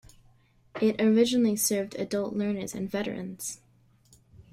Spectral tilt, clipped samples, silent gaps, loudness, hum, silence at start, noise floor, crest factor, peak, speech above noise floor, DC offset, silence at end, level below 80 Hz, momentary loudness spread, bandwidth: -4.5 dB/octave; under 0.1%; none; -27 LUFS; none; 0.75 s; -61 dBFS; 18 dB; -10 dBFS; 34 dB; under 0.1%; 0.1 s; -64 dBFS; 14 LU; 15.5 kHz